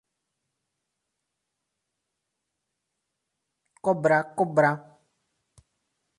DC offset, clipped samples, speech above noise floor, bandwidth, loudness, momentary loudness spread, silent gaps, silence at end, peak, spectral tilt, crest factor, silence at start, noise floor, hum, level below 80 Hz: under 0.1%; under 0.1%; 60 dB; 11.5 kHz; -24 LUFS; 8 LU; none; 1.4 s; -8 dBFS; -7 dB/octave; 22 dB; 3.85 s; -82 dBFS; none; -74 dBFS